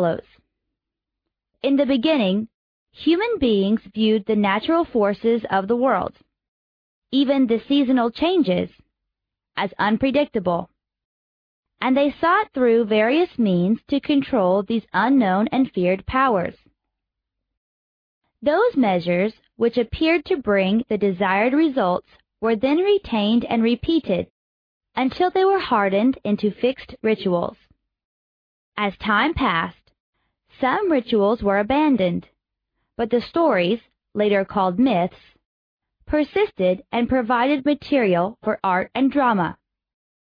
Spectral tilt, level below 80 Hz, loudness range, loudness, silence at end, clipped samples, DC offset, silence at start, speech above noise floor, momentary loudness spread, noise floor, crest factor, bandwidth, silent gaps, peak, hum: -9 dB/octave; -50 dBFS; 4 LU; -20 LUFS; 0.8 s; under 0.1%; under 0.1%; 0 s; 65 dB; 7 LU; -85 dBFS; 14 dB; 5.2 kHz; 2.54-2.86 s, 6.48-7.02 s, 11.05-11.63 s, 17.57-18.21 s, 24.30-24.81 s, 28.05-28.72 s, 30.00-30.13 s, 35.45-35.78 s; -6 dBFS; none